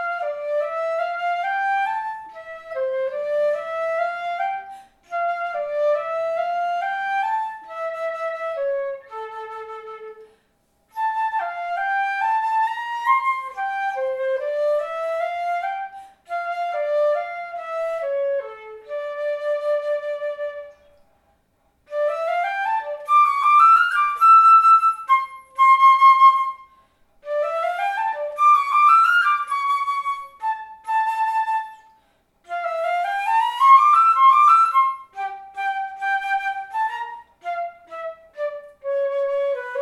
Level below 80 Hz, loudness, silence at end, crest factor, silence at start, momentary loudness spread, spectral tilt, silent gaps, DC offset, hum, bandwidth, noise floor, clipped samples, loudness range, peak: -70 dBFS; -20 LUFS; 0 s; 18 dB; 0 s; 18 LU; -0.5 dB/octave; none; under 0.1%; none; 12.5 kHz; -65 dBFS; under 0.1%; 12 LU; -2 dBFS